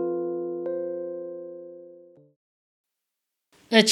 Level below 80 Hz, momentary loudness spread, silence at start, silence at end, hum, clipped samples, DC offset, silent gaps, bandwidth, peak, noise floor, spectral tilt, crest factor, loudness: under -90 dBFS; 23 LU; 0 s; 0 s; none; under 0.1%; under 0.1%; 2.36-2.84 s; 13 kHz; -2 dBFS; -84 dBFS; -3 dB/octave; 26 dB; -28 LUFS